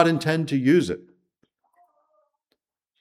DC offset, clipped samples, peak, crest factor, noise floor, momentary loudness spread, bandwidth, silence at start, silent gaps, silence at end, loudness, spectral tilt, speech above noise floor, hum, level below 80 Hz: under 0.1%; under 0.1%; -4 dBFS; 20 dB; -77 dBFS; 11 LU; 14 kHz; 0 s; none; 2.05 s; -22 LUFS; -6.5 dB/octave; 56 dB; none; -64 dBFS